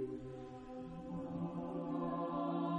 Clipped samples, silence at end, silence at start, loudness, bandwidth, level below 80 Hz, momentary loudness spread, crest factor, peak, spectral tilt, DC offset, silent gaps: under 0.1%; 0 s; 0 s; -43 LUFS; 8 kHz; -64 dBFS; 10 LU; 14 dB; -28 dBFS; -9 dB/octave; under 0.1%; none